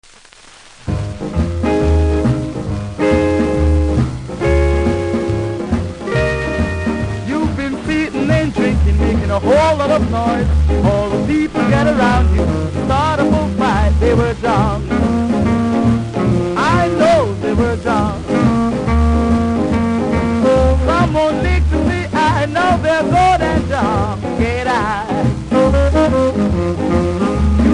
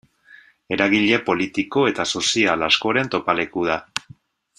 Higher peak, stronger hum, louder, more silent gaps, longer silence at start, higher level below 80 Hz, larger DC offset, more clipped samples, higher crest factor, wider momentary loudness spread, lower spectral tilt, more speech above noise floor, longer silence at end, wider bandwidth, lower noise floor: about the same, -2 dBFS vs 0 dBFS; neither; first, -15 LUFS vs -19 LUFS; neither; about the same, 0.8 s vs 0.7 s; first, -22 dBFS vs -58 dBFS; neither; neither; second, 12 dB vs 20 dB; about the same, 6 LU vs 7 LU; first, -7 dB/octave vs -3.5 dB/octave; about the same, 28 dB vs 30 dB; second, 0 s vs 0.6 s; about the same, 10.5 kHz vs 11 kHz; second, -42 dBFS vs -50 dBFS